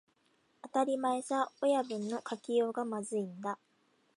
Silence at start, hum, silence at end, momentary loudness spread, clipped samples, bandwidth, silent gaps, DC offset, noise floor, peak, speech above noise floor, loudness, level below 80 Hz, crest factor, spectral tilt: 0.65 s; none; 0.6 s; 9 LU; under 0.1%; 11.5 kHz; none; under 0.1%; -73 dBFS; -18 dBFS; 39 dB; -34 LUFS; -88 dBFS; 18 dB; -5 dB/octave